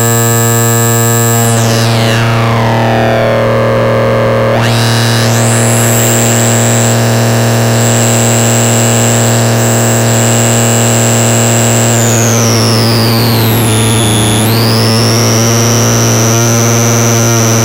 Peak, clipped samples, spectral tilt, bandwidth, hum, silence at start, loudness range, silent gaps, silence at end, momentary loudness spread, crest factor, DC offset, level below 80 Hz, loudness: -2 dBFS; under 0.1%; -4 dB/octave; 16 kHz; none; 0 s; 1 LU; none; 0 s; 2 LU; 6 dB; under 0.1%; -34 dBFS; -8 LUFS